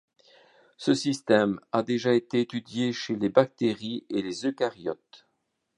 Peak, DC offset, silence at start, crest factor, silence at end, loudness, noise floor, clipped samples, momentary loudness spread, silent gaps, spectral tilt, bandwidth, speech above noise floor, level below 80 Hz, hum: -4 dBFS; under 0.1%; 0.8 s; 24 dB; 0.6 s; -27 LUFS; -77 dBFS; under 0.1%; 8 LU; none; -5.5 dB/octave; 11 kHz; 51 dB; -70 dBFS; none